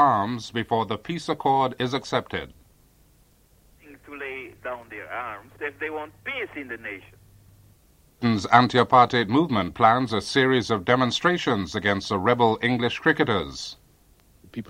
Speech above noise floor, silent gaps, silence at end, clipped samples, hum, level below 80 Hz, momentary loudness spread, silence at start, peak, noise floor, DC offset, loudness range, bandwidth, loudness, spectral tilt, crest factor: 35 dB; none; 0.05 s; under 0.1%; none; -56 dBFS; 17 LU; 0 s; -2 dBFS; -59 dBFS; under 0.1%; 14 LU; 16 kHz; -23 LUFS; -5.5 dB/octave; 22 dB